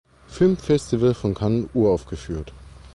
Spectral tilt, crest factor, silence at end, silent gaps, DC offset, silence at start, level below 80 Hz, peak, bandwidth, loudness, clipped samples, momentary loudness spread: -7.5 dB/octave; 14 dB; 0.05 s; none; under 0.1%; 0.3 s; -42 dBFS; -8 dBFS; 11.5 kHz; -22 LUFS; under 0.1%; 13 LU